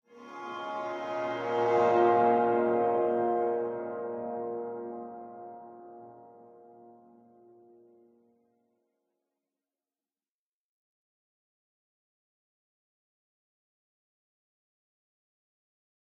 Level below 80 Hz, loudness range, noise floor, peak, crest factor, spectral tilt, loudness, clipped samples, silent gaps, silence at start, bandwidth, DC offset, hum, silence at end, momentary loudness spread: -82 dBFS; 20 LU; under -90 dBFS; -12 dBFS; 22 dB; -7 dB/octave; -29 LUFS; under 0.1%; none; 0.15 s; 7.2 kHz; under 0.1%; none; 9.1 s; 23 LU